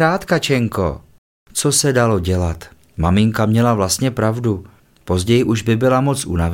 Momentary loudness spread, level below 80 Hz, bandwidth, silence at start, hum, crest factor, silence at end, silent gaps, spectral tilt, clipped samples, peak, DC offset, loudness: 9 LU; -36 dBFS; 17 kHz; 0 s; none; 16 dB; 0 s; 1.18-1.46 s; -5 dB/octave; under 0.1%; -2 dBFS; under 0.1%; -17 LUFS